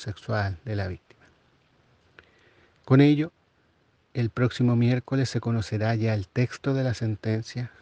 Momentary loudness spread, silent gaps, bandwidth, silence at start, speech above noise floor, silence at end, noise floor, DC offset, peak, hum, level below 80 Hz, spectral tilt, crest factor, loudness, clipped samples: 11 LU; none; 8.6 kHz; 0 s; 41 dB; 0.15 s; -65 dBFS; under 0.1%; -6 dBFS; none; -62 dBFS; -7.5 dB/octave; 22 dB; -26 LUFS; under 0.1%